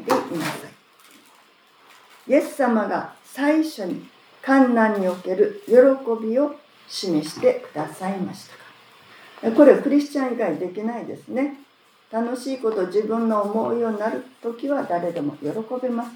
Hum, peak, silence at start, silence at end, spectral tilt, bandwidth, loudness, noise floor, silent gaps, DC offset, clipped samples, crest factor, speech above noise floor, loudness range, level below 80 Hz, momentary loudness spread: none; 0 dBFS; 0 s; 0 s; -6 dB/octave; 20 kHz; -22 LUFS; -54 dBFS; none; under 0.1%; under 0.1%; 22 dB; 33 dB; 6 LU; -82 dBFS; 15 LU